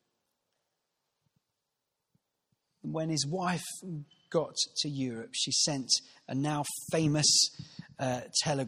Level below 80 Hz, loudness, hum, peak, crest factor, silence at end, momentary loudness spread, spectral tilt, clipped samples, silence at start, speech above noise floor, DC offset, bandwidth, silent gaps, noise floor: -70 dBFS; -30 LUFS; none; -12 dBFS; 22 dB; 0 s; 15 LU; -3 dB/octave; under 0.1%; 2.85 s; 53 dB; under 0.1%; 15 kHz; none; -85 dBFS